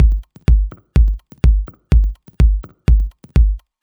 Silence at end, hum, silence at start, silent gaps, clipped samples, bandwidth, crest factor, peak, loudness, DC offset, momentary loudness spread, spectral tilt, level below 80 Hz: 0.25 s; none; 0 s; none; under 0.1%; 4.7 kHz; 12 dB; -2 dBFS; -18 LUFS; under 0.1%; 4 LU; -8.5 dB/octave; -14 dBFS